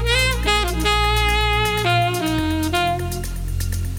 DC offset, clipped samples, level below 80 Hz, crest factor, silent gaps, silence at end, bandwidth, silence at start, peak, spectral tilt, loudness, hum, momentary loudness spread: under 0.1%; under 0.1%; -26 dBFS; 16 dB; none; 0 s; 18.5 kHz; 0 s; -4 dBFS; -4 dB/octave; -19 LUFS; none; 8 LU